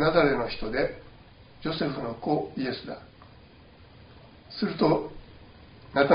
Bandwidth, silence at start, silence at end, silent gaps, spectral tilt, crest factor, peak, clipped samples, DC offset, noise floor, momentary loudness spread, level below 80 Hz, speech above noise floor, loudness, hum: 5.4 kHz; 0 s; 0 s; none; -4.5 dB/octave; 22 dB; -6 dBFS; under 0.1%; under 0.1%; -52 dBFS; 17 LU; -50 dBFS; 25 dB; -28 LUFS; none